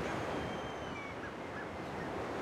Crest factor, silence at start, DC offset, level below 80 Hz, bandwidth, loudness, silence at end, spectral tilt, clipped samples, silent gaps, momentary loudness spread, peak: 14 dB; 0 s; under 0.1%; -58 dBFS; 16 kHz; -41 LUFS; 0 s; -5.5 dB/octave; under 0.1%; none; 5 LU; -28 dBFS